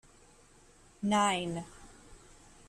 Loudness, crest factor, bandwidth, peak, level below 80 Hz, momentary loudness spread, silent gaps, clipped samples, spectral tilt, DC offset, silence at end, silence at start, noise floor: -31 LUFS; 18 dB; 13 kHz; -18 dBFS; -60 dBFS; 26 LU; none; under 0.1%; -4 dB/octave; under 0.1%; 0.5 s; 1 s; -60 dBFS